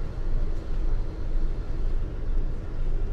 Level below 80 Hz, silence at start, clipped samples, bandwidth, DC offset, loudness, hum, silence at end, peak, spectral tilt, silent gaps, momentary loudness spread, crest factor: -24 dBFS; 0 s; under 0.1%; 4.4 kHz; under 0.1%; -34 LUFS; none; 0 s; -14 dBFS; -8 dB/octave; none; 1 LU; 10 dB